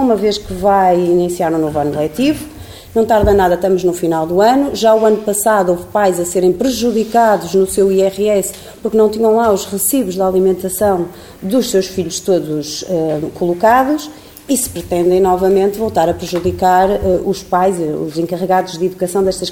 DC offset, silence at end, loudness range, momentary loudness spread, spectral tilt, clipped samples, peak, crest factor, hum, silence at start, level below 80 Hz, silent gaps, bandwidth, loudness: 0.2%; 0 s; 3 LU; 8 LU; -5 dB/octave; under 0.1%; 0 dBFS; 14 dB; none; 0 s; -38 dBFS; none; 17 kHz; -14 LUFS